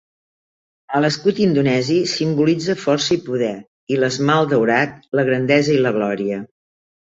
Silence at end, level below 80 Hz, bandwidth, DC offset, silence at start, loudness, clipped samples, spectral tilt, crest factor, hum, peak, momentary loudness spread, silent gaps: 0.65 s; -58 dBFS; 7.8 kHz; under 0.1%; 0.9 s; -18 LUFS; under 0.1%; -5.5 dB/octave; 16 dB; none; -2 dBFS; 8 LU; 3.67-3.87 s